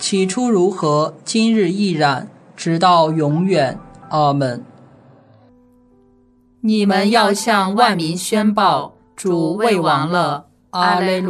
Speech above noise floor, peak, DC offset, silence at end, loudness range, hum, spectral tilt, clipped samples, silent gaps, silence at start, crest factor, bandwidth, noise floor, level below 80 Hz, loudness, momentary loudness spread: 38 dB; 0 dBFS; under 0.1%; 0 s; 5 LU; none; -5 dB/octave; under 0.1%; none; 0 s; 16 dB; 14 kHz; -53 dBFS; -58 dBFS; -16 LUFS; 10 LU